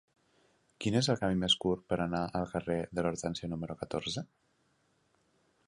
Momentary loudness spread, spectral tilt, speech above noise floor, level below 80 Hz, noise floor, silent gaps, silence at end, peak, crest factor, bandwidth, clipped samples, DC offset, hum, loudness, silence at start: 10 LU; -5 dB/octave; 40 dB; -58 dBFS; -73 dBFS; none; 1.4 s; -14 dBFS; 20 dB; 11.5 kHz; under 0.1%; under 0.1%; none; -33 LUFS; 0.8 s